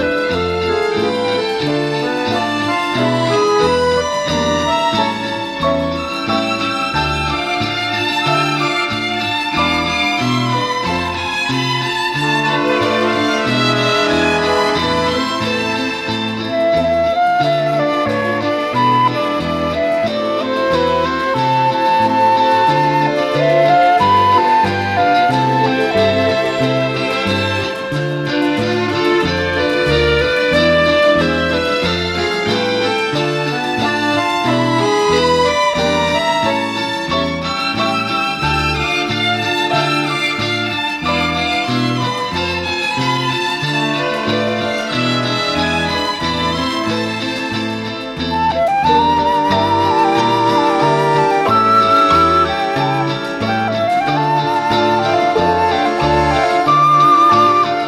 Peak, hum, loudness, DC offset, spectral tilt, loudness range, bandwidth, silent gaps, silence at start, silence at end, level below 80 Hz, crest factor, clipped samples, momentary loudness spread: -2 dBFS; none; -15 LUFS; under 0.1%; -5 dB/octave; 4 LU; 16 kHz; none; 0 s; 0 s; -40 dBFS; 14 dB; under 0.1%; 6 LU